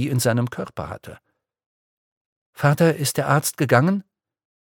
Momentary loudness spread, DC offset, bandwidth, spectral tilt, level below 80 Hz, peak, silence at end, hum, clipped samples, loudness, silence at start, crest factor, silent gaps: 14 LU; under 0.1%; 17.5 kHz; -5.5 dB/octave; -58 dBFS; 0 dBFS; 0.7 s; none; under 0.1%; -20 LUFS; 0 s; 22 dB; 1.66-2.53 s